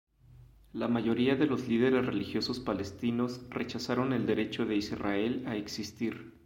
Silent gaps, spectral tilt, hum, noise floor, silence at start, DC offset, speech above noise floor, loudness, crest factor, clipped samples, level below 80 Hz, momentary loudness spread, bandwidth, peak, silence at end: none; -6 dB/octave; none; -56 dBFS; 0.3 s; under 0.1%; 25 dB; -32 LUFS; 18 dB; under 0.1%; -60 dBFS; 9 LU; 16 kHz; -14 dBFS; 0.15 s